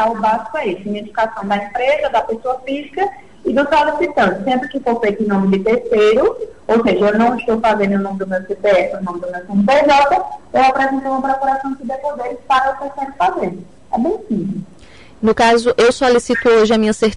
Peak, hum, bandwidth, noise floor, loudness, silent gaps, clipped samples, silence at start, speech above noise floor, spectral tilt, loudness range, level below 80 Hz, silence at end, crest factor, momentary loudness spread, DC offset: -4 dBFS; none; 11.5 kHz; -42 dBFS; -16 LUFS; none; under 0.1%; 0 s; 27 dB; -5.5 dB/octave; 4 LU; -46 dBFS; 0 s; 10 dB; 11 LU; 0.7%